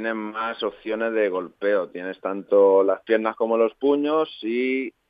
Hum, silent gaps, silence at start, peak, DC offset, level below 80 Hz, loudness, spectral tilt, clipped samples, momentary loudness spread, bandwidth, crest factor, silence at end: none; none; 0 s; -8 dBFS; under 0.1%; -70 dBFS; -23 LUFS; -8 dB/octave; under 0.1%; 11 LU; 5 kHz; 16 dB; 0.2 s